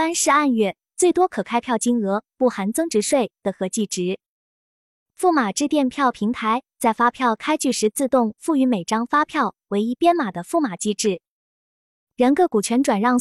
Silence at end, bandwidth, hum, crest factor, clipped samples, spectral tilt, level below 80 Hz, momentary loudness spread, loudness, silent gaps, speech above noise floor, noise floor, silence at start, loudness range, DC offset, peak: 0 s; 13.5 kHz; none; 14 dB; under 0.1%; -4 dB/octave; -64 dBFS; 6 LU; -21 LUFS; 4.28-5.06 s, 11.28-12.07 s; over 70 dB; under -90 dBFS; 0 s; 3 LU; under 0.1%; -6 dBFS